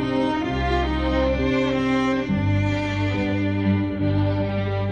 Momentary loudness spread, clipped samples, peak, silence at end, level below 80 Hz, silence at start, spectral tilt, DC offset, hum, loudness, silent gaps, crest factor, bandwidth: 2 LU; under 0.1%; -10 dBFS; 0 s; -34 dBFS; 0 s; -7.5 dB/octave; under 0.1%; none; -22 LUFS; none; 12 dB; 8.6 kHz